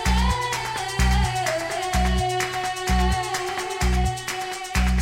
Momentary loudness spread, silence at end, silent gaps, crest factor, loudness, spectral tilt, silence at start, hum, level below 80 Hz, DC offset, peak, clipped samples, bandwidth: 5 LU; 0 s; none; 14 dB; -24 LUFS; -4 dB/octave; 0 s; none; -26 dBFS; under 0.1%; -8 dBFS; under 0.1%; 16.5 kHz